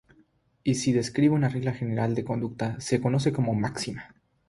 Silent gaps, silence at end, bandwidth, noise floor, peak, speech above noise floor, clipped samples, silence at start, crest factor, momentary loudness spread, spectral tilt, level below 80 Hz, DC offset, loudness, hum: none; 0.4 s; 11.5 kHz; -64 dBFS; -10 dBFS; 38 dB; under 0.1%; 0.65 s; 18 dB; 9 LU; -6 dB/octave; -58 dBFS; under 0.1%; -27 LUFS; none